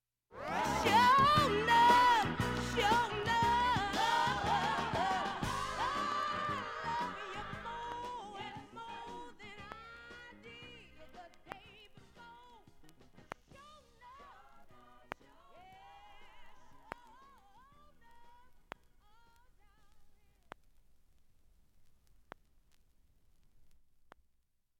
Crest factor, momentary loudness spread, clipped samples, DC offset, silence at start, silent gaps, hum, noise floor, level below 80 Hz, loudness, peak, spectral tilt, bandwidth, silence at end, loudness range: 22 dB; 25 LU; under 0.1%; under 0.1%; 0.35 s; none; none; -75 dBFS; -58 dBFS; -32 LUFS; -16 dBFS; -4 dB/octave; 16.5 kHz; 1.1 s; 27 LU